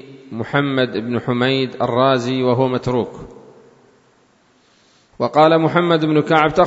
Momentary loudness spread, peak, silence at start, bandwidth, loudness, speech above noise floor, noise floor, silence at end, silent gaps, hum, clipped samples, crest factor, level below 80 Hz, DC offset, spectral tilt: 10 LU; 0 dBFS; 0.05 s; 8 kHz; -17 LUFS; 39 dB; -56 dBFS; 0 s; none; none; under 0.1%; 18 dB; -52 dBFS; under 0.1%; -7 dB/octave